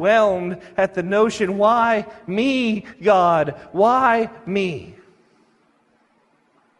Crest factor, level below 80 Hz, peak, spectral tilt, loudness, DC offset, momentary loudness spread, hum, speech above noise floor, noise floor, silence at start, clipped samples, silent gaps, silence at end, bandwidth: 16 dB; -58 dBFS; -4 dBFS; -5.5 dB/octave; -19 LUFS; under 0.1%; 9 LU; none; 43 dB; -61 dBFS; 0 s; under 0.1%; none; 1.9 s; 11.5 kHz